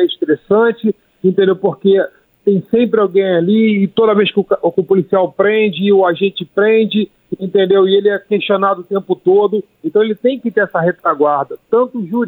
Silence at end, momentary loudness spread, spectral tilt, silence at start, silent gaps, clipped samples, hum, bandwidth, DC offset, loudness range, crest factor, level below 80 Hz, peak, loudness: 0 s; 6 LU; -9.5 dB/octave; 0 s; none; under 0.1%; none; 4.1 kHz; under 0.1%; 2 LU; 12 dB; -62 dBFS; -2 dBFS; -14 LUFS